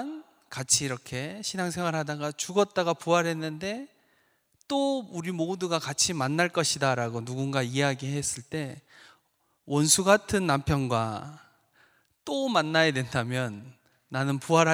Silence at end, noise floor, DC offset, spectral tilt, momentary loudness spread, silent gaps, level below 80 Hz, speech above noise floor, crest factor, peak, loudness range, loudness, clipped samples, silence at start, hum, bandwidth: 0 s; -71 dBFS; under 0.1%; -4 dB/octave; 13 LU; none; -58 dBFS; 44 dB; 24 dB; -4 dBFS; 3 LU; -27 LUFS; under 0.1%; 0 s; none; over 20 kHz